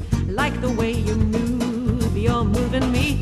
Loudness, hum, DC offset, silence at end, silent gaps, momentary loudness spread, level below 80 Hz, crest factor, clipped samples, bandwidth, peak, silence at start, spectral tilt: -21 LUFS; none; under 0.1%; 0 s; none; 2 LU; -28 dBFS; 16 dB; under 0.1%; 13 kHz; -6 dBFS; 0 s; -6.5 dB/octave